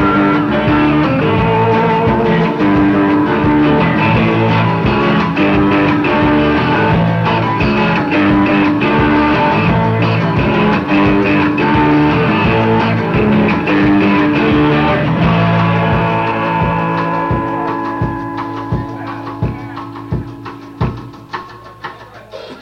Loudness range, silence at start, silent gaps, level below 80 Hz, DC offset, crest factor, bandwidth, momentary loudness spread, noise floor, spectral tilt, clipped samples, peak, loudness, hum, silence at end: 9 LU; 0 s; none; -32 dBFS; under 0.1%; 12 dB; 6.4 kHz; 12 LU; -32 dBFS; -8.5 dB/octave; under 0.1%; 0 dBFS; -13 LUFS; none; 0 s